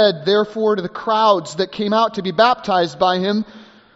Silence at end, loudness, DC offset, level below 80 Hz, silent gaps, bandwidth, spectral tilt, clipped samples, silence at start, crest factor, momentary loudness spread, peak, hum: 0.35 s; -17 LUFS; under 0.1%; -60 dBFS; none; 8 kHz; -3 dB/octave; under 0.1%; 0 s; 18 dB; 7 LU; 0 dBFS; none